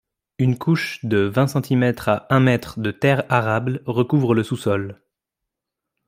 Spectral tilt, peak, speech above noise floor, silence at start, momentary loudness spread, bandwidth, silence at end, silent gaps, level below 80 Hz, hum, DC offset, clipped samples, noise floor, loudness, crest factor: -7 dB/octave; -2 dBFS; 64 dB; 0.4 s; 6 LU; 15.5 kHz; 1.15 s; none; -56 dBFS; none; under 0.1%; under 0.1%; -84 dBFS; -20 LUFS; 18 dB